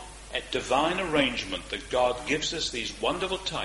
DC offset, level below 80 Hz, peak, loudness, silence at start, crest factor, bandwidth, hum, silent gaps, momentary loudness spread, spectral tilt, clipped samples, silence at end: under 0.1%; -48 dBFS; -10 dBFS; -28 LUFS; 0 s; 18 dB; 11.5 kHz; none; none; 7 LU; -3 dB/octave; under 0.1%; 0 s